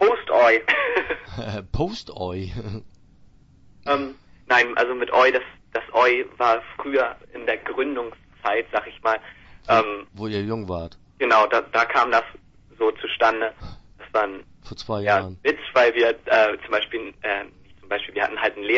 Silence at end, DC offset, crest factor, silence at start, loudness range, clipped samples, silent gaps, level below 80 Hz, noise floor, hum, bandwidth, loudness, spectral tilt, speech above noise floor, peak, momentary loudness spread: 0 s; under 0.1%; 18 dB; 0 s; 5 LU; under 0.1%; none; -48 dBFS; -52 dBFS; none; 7.6 kHz; -22 LUFS; -5.5 dB/octave; 29 dB; -4 dBFS; 14 LU